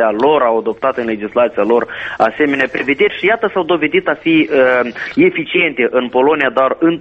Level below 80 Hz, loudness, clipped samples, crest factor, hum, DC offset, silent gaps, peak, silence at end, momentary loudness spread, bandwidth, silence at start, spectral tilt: -52 dBFS; -14 LUFS; under 0.1%; 14 dB; none; under 0.1%; none; 0 dBFS; 0 s; 5 LU; 6.6 kHz; 0 s; -7 dB/octave